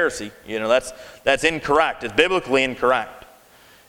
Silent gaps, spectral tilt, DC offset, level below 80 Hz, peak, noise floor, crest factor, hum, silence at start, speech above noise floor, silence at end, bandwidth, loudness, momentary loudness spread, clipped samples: none; -3.5 dB/octave; under 0.1%; -48 dBFS; 0 dBFS; -51 dBFS; 22 dB; none; 0 s; 30 dB; 0.7 s; 19 kHz; -20 LUFS; 11 LU; under 0.1%